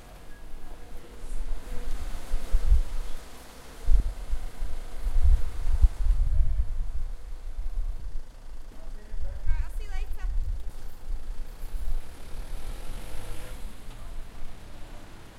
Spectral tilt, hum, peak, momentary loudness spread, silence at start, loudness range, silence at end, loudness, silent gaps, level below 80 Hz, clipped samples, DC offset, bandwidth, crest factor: -5.5 dB/octave; none; -6 dBFS; 19 LU; 0 s; 11 LU; 0 s; -34 LUFS; none; -28 dBFS; under 0.1%; under 0.1%; 11.5 kHz; 20 dB